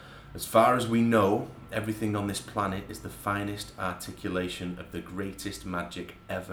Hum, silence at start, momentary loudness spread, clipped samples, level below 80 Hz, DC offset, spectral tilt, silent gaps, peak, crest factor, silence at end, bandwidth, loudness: none; 0 s; 15 LU; under 0.1%; -54 dBFS; under 0.1%; -5.5 dB/octave; none; -8 dBFS; 22 dB; 0 s; over 20 kHz; -30 LUFS